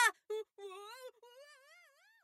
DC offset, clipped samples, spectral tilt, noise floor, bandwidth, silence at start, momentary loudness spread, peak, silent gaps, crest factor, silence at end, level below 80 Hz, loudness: under 0.1%; under 0.1%; 3 dB/octave; -66 dBFS; 16 kHz; 0 s; 19 LU; -18 dBFS; none; 24 dB; 0.7 s; under -90 dBFS; -41 LUFS